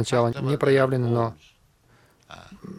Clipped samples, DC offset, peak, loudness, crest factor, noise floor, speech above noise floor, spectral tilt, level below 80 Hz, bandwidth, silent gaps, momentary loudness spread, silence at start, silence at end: under 0.1%; under 0.1%; -6 dBFS; -23 LUFS; 18 dB; -59 dBFS; 36 dB; -6.5 dB/octave; -58 dBFS; 13 kHz; none; 18 LU; 0 s; 0 s